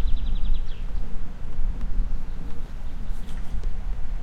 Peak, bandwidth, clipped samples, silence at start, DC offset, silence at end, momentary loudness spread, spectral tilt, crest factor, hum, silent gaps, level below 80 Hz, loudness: -8 dBFS; 4.1 kHz; under 0.1%; 0 s; under 0.1%; 0 s; 7 LU; -7 dB/octave; 12 dB; none; none; -24 dBFS; -35 LUFS